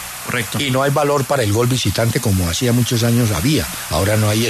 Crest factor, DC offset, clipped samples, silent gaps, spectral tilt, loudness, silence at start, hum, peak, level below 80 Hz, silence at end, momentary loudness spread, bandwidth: 14 dB; under 0.1%; under 0.1%; none; -4.5 dB/octave; -17 LUFS; 0 s; none; -4 dBFS; -38 dBFS; 0 s; 3 LU; 14 kHz